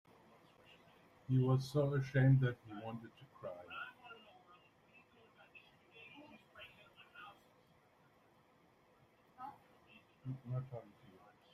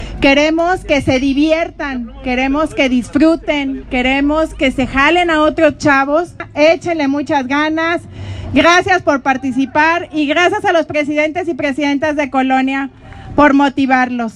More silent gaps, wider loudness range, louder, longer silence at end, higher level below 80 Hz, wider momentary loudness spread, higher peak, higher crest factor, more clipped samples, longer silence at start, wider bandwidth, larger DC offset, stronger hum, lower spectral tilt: neither; first, 23 LU vs 2 LU; second, -38 LUFS vs -13 LUFS; first, 0.7 s vs 0.05 s; second, -74 dBFS vs -36 dBFS; first, 26 LU vs 7 LU; second, -22 dBFS vs 0 dBFS; first, 22 dB vs 14 dB; neither; first, 1.3 s vs 0 s; second, 7 kHz vs 10.5 kHz; neither; neither; first, -8.5 dB/octave vs -5 dB/octave